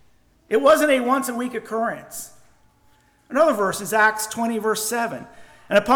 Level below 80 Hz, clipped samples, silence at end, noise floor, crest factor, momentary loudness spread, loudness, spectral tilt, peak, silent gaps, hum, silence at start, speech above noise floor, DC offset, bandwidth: -58 dBFS; under 0.1%; 0 s; -58 dBFS; 16 dB; 14 LU; -21 LUFS; -3 dB/octave; -6 dBFS; none; none; 0.5 s; 38 dB; under 0.1%; 20 kHz